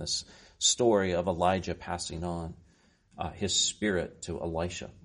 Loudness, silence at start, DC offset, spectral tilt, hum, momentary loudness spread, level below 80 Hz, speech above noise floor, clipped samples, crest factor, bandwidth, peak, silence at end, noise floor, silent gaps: -30 LUFS; 0 s; under 0.1%; -3 dB/octave; none; 12 LU; -52 dBFS; 34 dB; under 0.1%; 20 dB; 10.5 kHz; -10 dBFS; 0.05 s; -64 dBFS; none